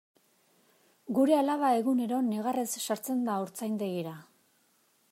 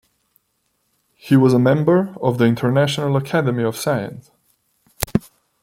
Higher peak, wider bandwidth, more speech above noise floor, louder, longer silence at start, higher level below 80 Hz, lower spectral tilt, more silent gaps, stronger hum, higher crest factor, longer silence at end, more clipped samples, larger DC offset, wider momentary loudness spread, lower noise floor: second, -14 dBFS vs 0 dBFS; about the same, 16 kHz vs 16.5 kHz; second, 40 dB vs 52 dB; second, -30 LUFS vs -18 LUFS; second, 1.1 s vs 1.25 s; second, -84 dBFS vs -48 dBFS; second, -5 dB/octave vs -6.5 dB/octave; neither; neither; about the same, 18 dB vs 20 dB; first, 0.9 s vs 0.45 s; neither; neither; about the same, 11 LU vs 9 LU; about the same, -69 dBFS vs -69 dBFS